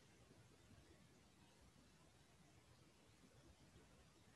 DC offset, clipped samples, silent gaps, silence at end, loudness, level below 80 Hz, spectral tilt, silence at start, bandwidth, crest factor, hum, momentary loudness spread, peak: under 0.1%; under 0.1%; none; 0 s; -69 LUFS; -78 dBFS; -4.5 dB/octave; 0 s; 12 kHz; 14 dB; none; 1 LU; -54 dBFS